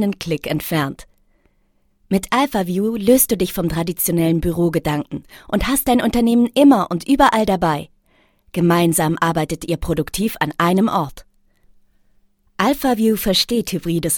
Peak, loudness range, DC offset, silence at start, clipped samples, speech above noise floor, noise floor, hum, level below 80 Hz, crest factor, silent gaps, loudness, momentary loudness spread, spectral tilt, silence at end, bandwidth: 0 dBFS; 5 LU; under 0.1%; 0 s; under 0.1%; 44 dB; -61 dBFS; none; -38 dBFS; 18 dB; none; -18 LUFS; 9 LU; -5 dB/octave; 0 s; 20 kHz